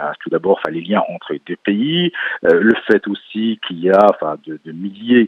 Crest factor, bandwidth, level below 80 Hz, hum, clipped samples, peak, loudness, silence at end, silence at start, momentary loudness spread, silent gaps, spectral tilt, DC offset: 16 dB; 6 kHz; -62 dBFS; none; under 0.1%; 0 dBFS; -16 LUFS; 0 s; 0 s; 15 LU; none; -7.5 dB/octave; under 0.1%